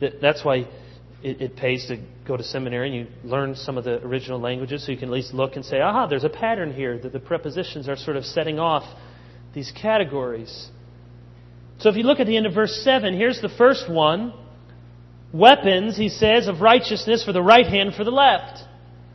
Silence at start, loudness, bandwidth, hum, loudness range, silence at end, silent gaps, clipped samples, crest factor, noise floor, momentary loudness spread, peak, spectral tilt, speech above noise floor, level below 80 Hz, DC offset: 0 s; -20 LUFS; 6.6 kHz; 60 Hz at -45 dBFS; 10 LU; 0.1 s; none; under 0.1%; 22 dB; -44 dBFS; 15 LU; 0 dBFS; -5.5 dB/octave; 24 dB; -50 dBFS; under 0.1%